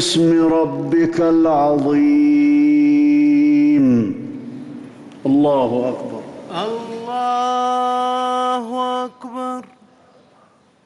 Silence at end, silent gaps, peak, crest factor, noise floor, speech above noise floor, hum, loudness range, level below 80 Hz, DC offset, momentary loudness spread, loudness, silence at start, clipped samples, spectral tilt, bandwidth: 1.25 s; none; -8 dBFS; 8 dB; -53 dBFS; 37 dB; none; 7 LU; -56 dBFS; under 0.1%; 15 LU; -16 LUFS; 0 s; under 0.1%; -6 dB/octave; 11.5 kHz